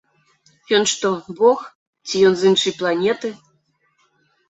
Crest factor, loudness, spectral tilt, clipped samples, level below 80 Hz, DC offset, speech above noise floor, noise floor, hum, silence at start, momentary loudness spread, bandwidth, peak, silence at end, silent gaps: 18 dB; -18 LUFS; -3.5 dB/octave; under 0.1%; -62 dBFS; under 0.1%; 47 dB; -64 dBFS; none; 0.7 s; 11 LU; 8.2 kHz; -2 dBFS; 1.15 s; 1.75-1.93 s